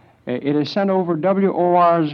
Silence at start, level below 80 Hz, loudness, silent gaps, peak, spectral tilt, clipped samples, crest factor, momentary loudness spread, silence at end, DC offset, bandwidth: 0.25 s; -66 dBFS; -18 LUFS; none; -4 dBFS; -8.5 dB/octave; under 0.1%; 12 dB; 8 LU; 0 s; under 0.1%; 6.6 kHz